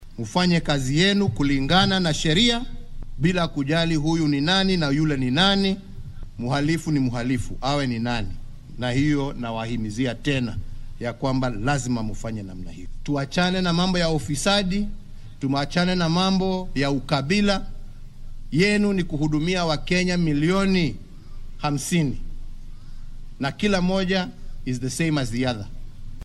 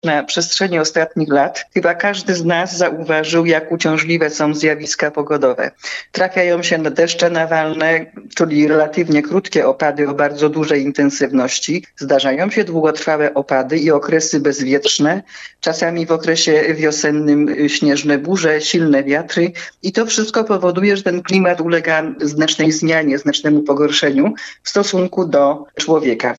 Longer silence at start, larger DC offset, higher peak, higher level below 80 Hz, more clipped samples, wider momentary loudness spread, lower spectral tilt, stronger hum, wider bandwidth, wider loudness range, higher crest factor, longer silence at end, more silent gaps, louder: about the same, 0 s vs 0.05 s; neither; second, -6 dBFS vs -2 dBFS; first, -34 dBFS vs -64 dBFS; neither; first, 14 LU vs 4 LU; about the same, -5 dB/octave vs -4 dB/octave; neither; first, 13 kHz vs 8 kHz; first, 5 LU vs 1 LU; about the same, 18 dB vs 14 dB; about the same, 0 s vs 0.05 s; neither; second, -23 LUFS vs -15 LUFS